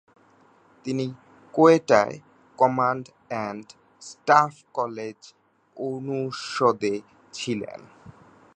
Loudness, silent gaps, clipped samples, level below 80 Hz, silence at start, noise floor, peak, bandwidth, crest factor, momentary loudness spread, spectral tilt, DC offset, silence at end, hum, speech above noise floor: -24 LUFS; none; under 0.1%; -70 dBFS; 0.85 s; -58 dBFS; -2 dBFS; 9.4 kHz; 22 dB; 20 LU; -5.5 dB/octave; under 0.1%; 0.45 s; none; 34 dB